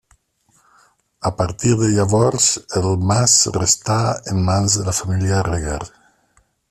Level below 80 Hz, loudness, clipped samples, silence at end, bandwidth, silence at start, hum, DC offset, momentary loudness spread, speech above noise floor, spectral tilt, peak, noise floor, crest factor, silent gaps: -42 dBFS; -17 LUFS; under 0.1%; 0.85 s; 13.5 kHz; 1.2 s; none; under 0.1%; 11 LU; 43 dB; -4 dB/octave; 0 dBFS; -60 dBFS; 18 dB; none